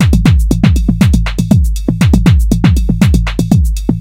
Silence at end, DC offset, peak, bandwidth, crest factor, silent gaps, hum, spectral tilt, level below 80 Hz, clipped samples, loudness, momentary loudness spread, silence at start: 0 s; under 0.1%; 0 dBFS; 16.5 kHz; 8 dB; none; none; -7 dB/octave; -14 dBFS; 0.7%; -11 LUFS; 4 LU; 0 s